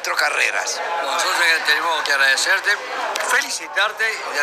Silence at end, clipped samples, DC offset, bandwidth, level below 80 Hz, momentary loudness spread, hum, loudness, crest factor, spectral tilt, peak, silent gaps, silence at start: 0 s; under 0.1%; under 0.1%; 15.5 kHz; -70 dBFS; 7 LU; none; -18 LUFS; 16 dB; 2 dB/octave; -2 dBFS; none; 0 s